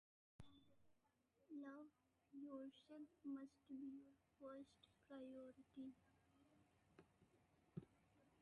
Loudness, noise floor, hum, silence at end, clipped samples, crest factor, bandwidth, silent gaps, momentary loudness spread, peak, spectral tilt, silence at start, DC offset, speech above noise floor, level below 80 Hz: -60 LUFS; -84 dBFS; none; 0 s; under 0.1%; 20 dB; 9.6 kHz; none; 8 LU; -40 dBFS; -7.5 dB/octave; 0.4 s; under 0.1%; 26 dB; -88 dBFS